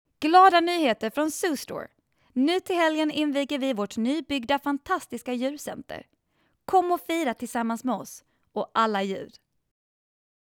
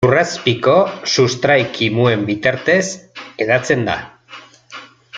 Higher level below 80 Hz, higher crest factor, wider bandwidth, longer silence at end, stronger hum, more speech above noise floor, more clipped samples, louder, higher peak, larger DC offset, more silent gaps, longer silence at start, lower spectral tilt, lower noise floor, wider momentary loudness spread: second, -66 dBFS vs -52 dBFS; about the same, 20 dB vs 16 dB; first, 19 kHz vs 9.4 kHz; first, 1.2 s vs 0 s; neither; first, 46 dB vs 25 dB; neither; second, -25 LUFS vs -16 LUFS; second, -6 dBFS vs 0 dBFS; neither; neither; first, 0.2 s vs 0 s; about the same, -3.5 dB/octave vs -4.5 dB/octave; first, -71 dBFS vs -40 dBFS; second, 16 LU vs 21 LU